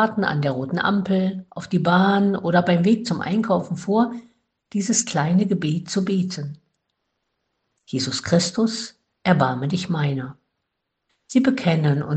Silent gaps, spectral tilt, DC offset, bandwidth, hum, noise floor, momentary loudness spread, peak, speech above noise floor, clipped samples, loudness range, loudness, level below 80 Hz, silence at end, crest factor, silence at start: none; -5.5 dB/octave; under 0.1%; 9 kHz; none; -78 dBFS; 10 LU; -2 dBFS; 58 dB; under 0.1%; 5 LU; -21 LUFS; -60 dBFS; 0 s; 20 dB; 0 s